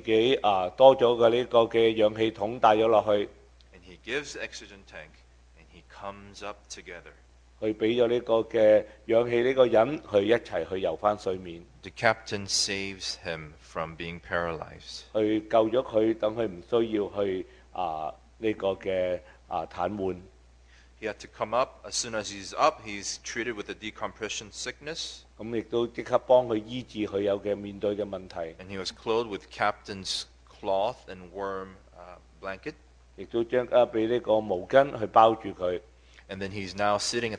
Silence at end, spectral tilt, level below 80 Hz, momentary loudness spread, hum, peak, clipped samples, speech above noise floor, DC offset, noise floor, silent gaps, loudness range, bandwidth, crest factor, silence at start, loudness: 0 s; -4 dB/octave; -56 dBFS; 18 LU; none; -4 dBFS; under 0.1%; 28 dB; under 0.1%; -56 dBFS; none; 9 LU; 10.5 kHz; 24 dB; 0.05 s; -27 LUFS